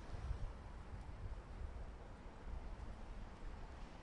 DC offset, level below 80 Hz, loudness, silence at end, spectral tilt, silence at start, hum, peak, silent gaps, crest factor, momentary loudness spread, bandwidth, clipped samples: under 0.1%; -50 dBFS; -53 LUFS; 0 s; -6.5 dB/octave; 0 s; none; -32 dBFS; none; 16 dB; 6 LU; 10.5 kHz; under 0.1%